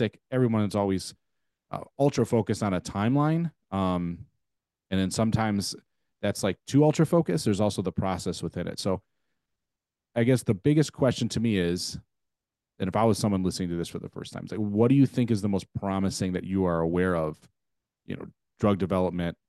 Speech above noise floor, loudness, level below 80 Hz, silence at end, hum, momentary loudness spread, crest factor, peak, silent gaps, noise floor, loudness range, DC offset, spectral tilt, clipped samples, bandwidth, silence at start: 62 dB; -27 LUFS; -60 dBFS; 0.15 s; none; 12 LU; 18 dB; -10 dBFS; none; -88 dBFS; 3 LU; under 0.1%; -6.5 dB/octave; under 0.1%; 12.5 kHz; 0 s